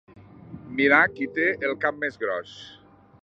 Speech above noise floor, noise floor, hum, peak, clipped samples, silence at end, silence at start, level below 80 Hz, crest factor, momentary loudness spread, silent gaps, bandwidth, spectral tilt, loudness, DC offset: 20 dB; -44 dBFS; none; -4 dBFS; under 0.1%; 0.5 s; 0.15 s; -62 dBFS; 22 dB; 24 LU; none; 7.8 kHz; -6 dB/octave; -23 LUFS; under 0.1%